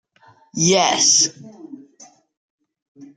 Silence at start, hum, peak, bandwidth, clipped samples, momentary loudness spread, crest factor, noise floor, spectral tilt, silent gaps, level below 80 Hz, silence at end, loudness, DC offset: 0.55 s; none; -2 dBFS; 11 kHz; under 0.1%; 7 LU; 20 dB; -53 dBFS; -2 dB/octave; 2.37-2.58 s, 2.82-2.95 s; -64 dBFS; 0.1 s; -15 LUFS; under 0.1%